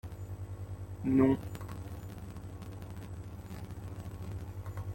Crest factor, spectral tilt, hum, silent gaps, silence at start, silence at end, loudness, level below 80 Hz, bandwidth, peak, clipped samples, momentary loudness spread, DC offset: 22 dB; -8.5 dB/octave; none; none; 0.05 s; 0 s; -37 LUFS; -52 dBFS; 16.5 kHz; -14 dBFS; under 0.1%; 17 LU; under 0.1%